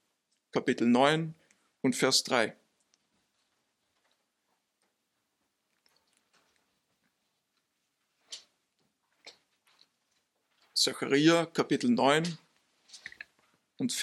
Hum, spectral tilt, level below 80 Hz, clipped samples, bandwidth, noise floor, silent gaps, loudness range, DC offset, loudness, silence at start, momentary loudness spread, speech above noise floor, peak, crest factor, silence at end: none; -3.5 dB/octave; -82 dBFS; under 0.1%; 14.5 kHz; -80 dBFS; none; 8 LU; under 0.1%; -28 LUFS; 0.55 s; 22 LU; 53 dB; -10 dBFS; 24 dB; 0 s